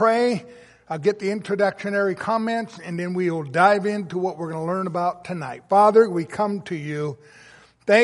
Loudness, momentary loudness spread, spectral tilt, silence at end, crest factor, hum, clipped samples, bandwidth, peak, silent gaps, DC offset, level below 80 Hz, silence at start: -22 LUFS; 14 LU; -6.5 dB/octave; 0 s; 20 dB; none; under 0.1%; 11.5 kHz; -2 dBFS; none; under 0.1%; -68 dBFS; 0 s